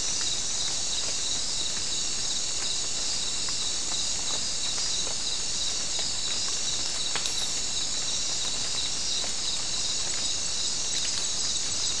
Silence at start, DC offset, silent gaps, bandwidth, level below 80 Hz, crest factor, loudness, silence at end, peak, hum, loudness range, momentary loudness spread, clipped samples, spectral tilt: 0 s; 2%; none; 12 kHz; -50 dBFS; 20 dB; -26 LUFS; 0 s; -10 dBFS; none; 0 LU; 1 LU; under 0.1%; 0.5 dB/octave